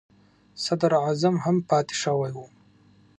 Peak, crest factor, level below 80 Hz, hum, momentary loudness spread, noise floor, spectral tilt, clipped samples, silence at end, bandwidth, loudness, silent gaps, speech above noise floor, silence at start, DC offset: -8 dBFS; 18 dB; -68 dBFS; 50 Hz at -60 dBFS; 10 LU; -57 dBFS; -5.5 dB/octave; under 0.1%; 0.75 s; 10.5 kHz; -24 LUFS; none; 33 dB; 0.55 s; under 0.1%